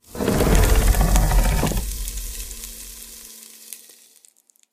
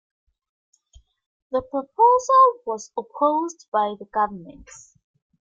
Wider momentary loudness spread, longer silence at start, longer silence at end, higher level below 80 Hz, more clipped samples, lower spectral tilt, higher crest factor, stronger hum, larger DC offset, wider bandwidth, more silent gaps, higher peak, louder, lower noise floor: first, 20 LU vs 15 LU; second, 0.15 s vs 1.5 s; about the same, 0.95 s vs 0.95 s; first, -22 dBFS vs -60 dBFS; neither; about the same, -4.5 dB/octave vs -4.5 dB/octave; about the same, 20 dB vs 18 dB; neither; neither; first, 15.5 kHz vs 7.8 kHz; second, none vs 3.68-3.72 s; first, 0 dBFS vs -6 dBFS; about the same, -21 LUFS vs -21 LUFS; about the same, -56 dBFS vs -55 dBFS